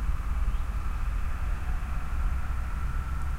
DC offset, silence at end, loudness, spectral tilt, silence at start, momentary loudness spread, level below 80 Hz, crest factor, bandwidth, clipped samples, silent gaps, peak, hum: under 0.1%; 0 s; -34 LUFS; -6.5 dB/octave; 0 s; 2 LU; -28 dBFS; 10 dB; 15 kHz; under 0.1%; none; -18 dBFS; none